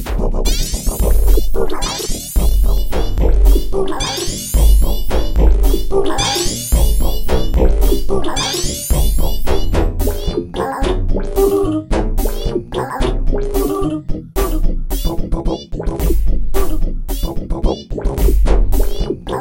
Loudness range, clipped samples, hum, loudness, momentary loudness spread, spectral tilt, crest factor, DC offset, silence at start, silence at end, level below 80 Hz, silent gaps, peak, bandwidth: 4 LU; under 0.1%; none; -18 LUFS; 7 LU; -5 dB/octave; 12 dB; under 0.1%; 0 s; 0 s; -14 dBFS; none; 0 dBFS; 16.5 kHz